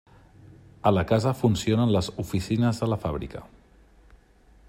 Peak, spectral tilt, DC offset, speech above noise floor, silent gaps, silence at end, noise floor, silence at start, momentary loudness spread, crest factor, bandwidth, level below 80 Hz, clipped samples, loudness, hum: -8 dBFS; -7 dB/octave; under 0.1%; 32 dB; none; 1.25 s; -56 dBFS; 0.85 s; 10 LU; 18 dB; 16 kHz; -48 dBFS; under 0.1%; -25 LUFS; none